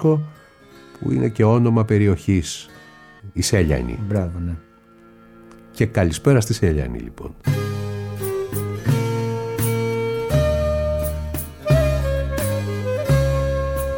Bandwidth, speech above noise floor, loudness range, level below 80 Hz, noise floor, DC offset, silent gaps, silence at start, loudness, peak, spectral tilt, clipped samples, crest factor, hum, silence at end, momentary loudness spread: 18 kHz; 30 dB; 4 LU; -32 dBFS; -48 dBFS; under 0.1%; none; 0 s; -21 LUFS; -4 dBFS; -6.5 dB/octave; under 0.1%; 18 dB; none; 0 s; 12 LU